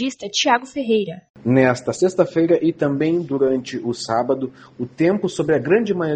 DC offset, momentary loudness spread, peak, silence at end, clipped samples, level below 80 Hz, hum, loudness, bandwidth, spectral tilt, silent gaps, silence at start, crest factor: under 0.1%; 9 LU; -2 dBFS; 0 s; under 0.1%; -58 dBFS; none; -19 LUFS; 9.4 kHz; -5.5 dB/octave; 1.30-1.34 s; 0 s; 18 dB